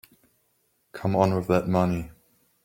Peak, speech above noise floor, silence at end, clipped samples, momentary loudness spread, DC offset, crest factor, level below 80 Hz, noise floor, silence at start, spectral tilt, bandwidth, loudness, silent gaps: -6 dBFS; 47 dB; 0.55 s; under 0.1%; 17 LU; under 0.1%; 22 dB; -54 dBFS; -70 dBFS; 0.95 s; -8 dB/octave; 16.5 kHz; -25 LUFS; none